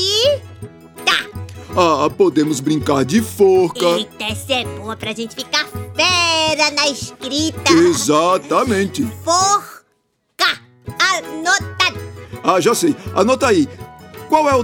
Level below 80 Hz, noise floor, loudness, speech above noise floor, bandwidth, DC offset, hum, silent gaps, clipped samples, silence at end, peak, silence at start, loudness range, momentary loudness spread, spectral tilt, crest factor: -52 dBFS; -65 dBFS; -16 LUFS; 50 dB; 19 kHz; under 0.1%; none; none; under 0.1%; 0 s; 0 dBFS; 0 s; 3 LU; 12 LU; -3.5 dB/octave; 16 dB